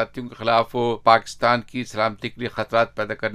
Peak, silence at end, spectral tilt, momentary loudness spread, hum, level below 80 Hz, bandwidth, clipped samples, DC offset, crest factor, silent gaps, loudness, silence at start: 0 dBFS; 0 s; -5 dB/octave; 11 LU; none; -54 dBFS; 14 kHz; under 0.1%; under 0.1%; 22 dB; none; -22 LUFS; 0 s